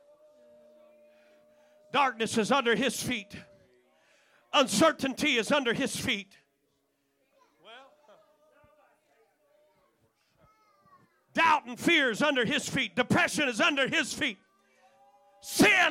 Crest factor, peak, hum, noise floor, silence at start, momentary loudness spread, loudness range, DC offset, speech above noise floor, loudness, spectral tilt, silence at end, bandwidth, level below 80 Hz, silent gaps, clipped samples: 18 dB; -12 dBFS; none; -75 dBFS; 1.95 s; 10 LU; 7 LU; under 0.1%; 48 dB; -27 LUFS; -3 dB/octave; 0 s; 16.5 kHz; -66 dBFS; none; under 0.1%